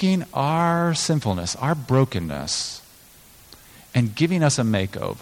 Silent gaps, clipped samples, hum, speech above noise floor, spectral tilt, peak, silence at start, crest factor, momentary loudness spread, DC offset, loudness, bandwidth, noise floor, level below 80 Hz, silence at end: none; under 0.1%; none; 28 dB; -5 dB/octave; -6 dBFS; 0 s; 16 dB; 7 LU; under 0.1%; -22 LUFS; 17 kHz; -49 dBFS; -50 dBFS; 0 s